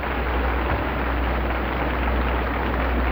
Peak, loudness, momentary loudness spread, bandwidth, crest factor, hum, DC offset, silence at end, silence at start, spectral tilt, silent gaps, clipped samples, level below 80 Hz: -10 dBFS; -24 LUFS; 1 LU; 16.5 kHz; 12 dB; none; under 0.1%; 0 s; 0 s; -9 dB/octave; none; under 0.1%; -26 dBFS